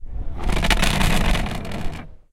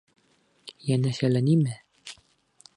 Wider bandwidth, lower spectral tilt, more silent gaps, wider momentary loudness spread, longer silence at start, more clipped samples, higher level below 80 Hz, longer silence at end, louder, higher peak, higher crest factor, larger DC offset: first, 16.5 kHz vs 11.5 kHz; second, -4 dB/octave vs -7.5 dB/octave; neither; second, 15 LU vs 23 LU; second, 0 s vs 0.65 s; neither; first, -24 dBFS vs -68 dBFS; second, 0.15 s vs 0.65 s; first, -22 LUFS vs -25 LUFS; first, -2 dBFS vs -12 dBFS; about the same, 18 dB vs 16 dB; neither